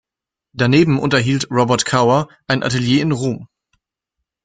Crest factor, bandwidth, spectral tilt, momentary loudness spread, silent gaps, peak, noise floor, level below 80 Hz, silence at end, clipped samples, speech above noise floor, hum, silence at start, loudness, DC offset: 18 dB; 9.4 kHz; -5.5 dB/octave; 7 LU; none; 0 dBFS; -86 dBFS; -50 dBFS; 1 s; under 0.1%; 71 dB; none; 0.55 s; -16 LUFS; under 0.1%